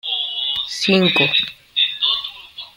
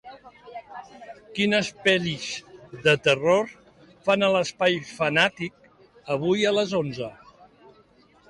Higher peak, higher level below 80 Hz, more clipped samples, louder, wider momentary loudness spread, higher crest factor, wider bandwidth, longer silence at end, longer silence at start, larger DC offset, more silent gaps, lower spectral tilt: first, -2 dBFS vs -6 dBFS; about the same, -58 dBFS vs -62 dBFS; neither; first, -17 LUFS vs -23 LUFS; second, 9 LU vs 21 LU; about the same, 18 dB vs 18 dB; first, 16.5 kHz vs 11.5 kHz; second, 0.1 s vs 1.15 s; about the same, 0.05 s vs 0.05 s; neither; neither; about the same, -4 dB/octave vs -4.5 dB/octave